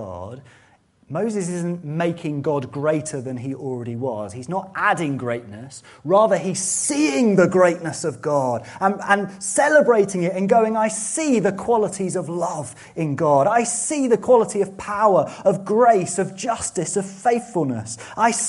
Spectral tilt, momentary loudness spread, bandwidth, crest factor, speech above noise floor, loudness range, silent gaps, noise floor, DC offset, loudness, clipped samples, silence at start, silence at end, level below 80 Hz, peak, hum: -5 dB/octave; 12 LU; 11.5 kHz; 20 dB; 36 dB; 7 LU; none; -56 dBFS; under 0.1%; -20 LUFS; under 0.1%; 0 s; 0 s; -60 dBFS; -2 dBFS; none